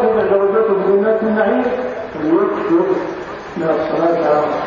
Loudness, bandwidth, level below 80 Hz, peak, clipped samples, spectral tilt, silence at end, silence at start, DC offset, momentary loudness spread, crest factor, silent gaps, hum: -16 LUFS; 7.2 kHz; -50 dBFS; -2 dBFS; under 0.1%; -8 dB/octave; 0 s; 0 s; under 0.1%; 8 LU; 14 dB; none; none